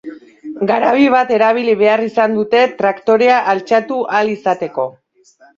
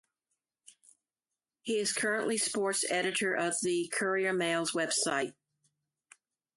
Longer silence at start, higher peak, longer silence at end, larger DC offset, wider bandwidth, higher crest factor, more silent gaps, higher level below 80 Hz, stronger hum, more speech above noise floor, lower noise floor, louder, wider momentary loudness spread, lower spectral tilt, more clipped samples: second, 0.05 s vs 1.65 s; first, 0 dBFS vs -16 dBFS; second, 0.65 s vs 1.25 s; neither; second, 7.4 kHz vs 12 kHz; about the same, 14 dB vs 16 dB; neither; first, -62 dBFS vs -80 dBFS; neither; second, 36 dB vs over 59 dB; second, -49 dBFS vs under -90 dBFS; first, -14 LUFS vs -31 LUFS; first, 10 LU vs 3 LU; first, -6 dB/octave vs -2 dB/octave; neither